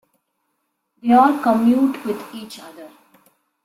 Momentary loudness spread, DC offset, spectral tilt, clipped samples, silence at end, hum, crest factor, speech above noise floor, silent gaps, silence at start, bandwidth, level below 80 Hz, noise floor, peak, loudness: 22 LU; under 0.1%; -6 dB/octave; under 0.1%; 0.75 s; none; 18 dB; 55 dB; none; 1.05 s; 15 kHz; -64 dBFS; -73 dBFS; -4 dBFS; -17 LUFS